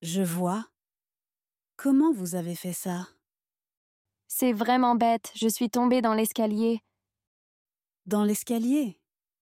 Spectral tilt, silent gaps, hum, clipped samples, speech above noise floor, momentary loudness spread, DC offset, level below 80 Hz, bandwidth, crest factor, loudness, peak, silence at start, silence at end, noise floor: -5 dB/octave; 3.77-4.05 s, 7.27-7.65 s; none; under 0.1%; over 64 dB; 11 LU; under 0.1%; -76 dBFS; 16.5 kHz; 18 dB; -26 LUFS; -10 dBFS; 0 s; 0.55 s; under -90 dBFS